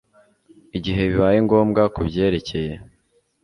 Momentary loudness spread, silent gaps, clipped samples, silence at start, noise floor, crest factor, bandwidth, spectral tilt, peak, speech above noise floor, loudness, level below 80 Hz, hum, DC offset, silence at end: 13 LU; none; under 0.1%; 0.75 s; -64 dBFS; 18 dB; 11 kHz; -8 dB/octave; -2 dBFS; 45 dB; -20 LUFS; -40 dBFS; none; under 0.1%; 0.6 s